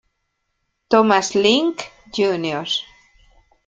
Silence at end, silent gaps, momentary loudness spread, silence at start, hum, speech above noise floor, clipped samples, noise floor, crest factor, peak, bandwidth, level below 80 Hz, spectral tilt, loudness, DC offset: 0.85 s; none; 9 LU; 0.9 s; none; 55 dB; under 0.1%; -73 dBFS; 20 dB; -2 dBFS; 9.2 kHz; -58 dBFS; -3.5 dB/octave; -18 LUFS; under 0.1%